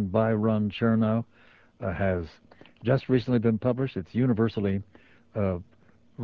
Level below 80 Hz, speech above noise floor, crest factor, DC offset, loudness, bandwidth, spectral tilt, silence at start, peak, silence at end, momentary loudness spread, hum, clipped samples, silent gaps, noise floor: -48 dBFS; 24 dB; 16 dB; under 0.1%; -27 LUFS; 5.2 kHz; -10 dB/octave; 0 s; -10 dBFS; 0 s; 10 LU; none; under 0.1%; none; -50 dBFS